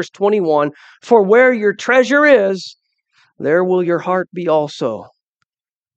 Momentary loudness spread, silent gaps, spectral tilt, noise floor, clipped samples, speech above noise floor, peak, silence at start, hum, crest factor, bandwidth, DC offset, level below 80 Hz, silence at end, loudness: 13 LU; none; -5.5 dB/octave; under -90 dBFS; under 0.1%; over 76 dB; 0 dBFS; 0 s; none; 16 dB; 8.2 kHz; under 0.1%; -68 dBFS; 0.9 s; -14 LUFS